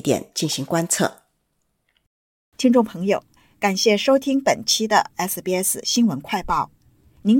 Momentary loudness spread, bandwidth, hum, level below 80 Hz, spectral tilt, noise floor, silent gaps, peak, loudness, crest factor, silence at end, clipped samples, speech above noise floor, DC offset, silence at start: 7 LU; 17 kHz; none; -52 dBFS; -3.5 dB/octave; -71 dBFS; 2.07-2.52 s; -4 dBFS; -20 LUFS; 18 dB; 0 s; under 0.1%; 51 dB; under 0.1%; 0.05 s